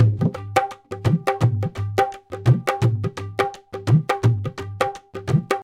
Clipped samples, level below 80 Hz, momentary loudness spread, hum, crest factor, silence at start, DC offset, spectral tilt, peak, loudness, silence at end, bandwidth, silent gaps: under 0.1%; -48 dBFS; 7 LU; none; 18 dB; 0 s; under 0.1%; -7 dB/octave; -2 dBFS; -22 LUFS; 0 s; 15 kHz; none